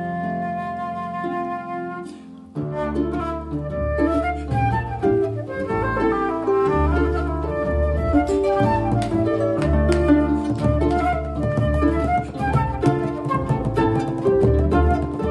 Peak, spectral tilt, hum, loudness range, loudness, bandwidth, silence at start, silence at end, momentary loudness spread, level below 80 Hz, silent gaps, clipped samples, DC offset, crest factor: -4 dBFS; -8.5 dB/octave; none; 6 LU; -21 LUFS; 11 kHz; 0 s; 0 s; 9 LU; -28 dBFS; none; under 0.1%; under 0.1%; 18 dB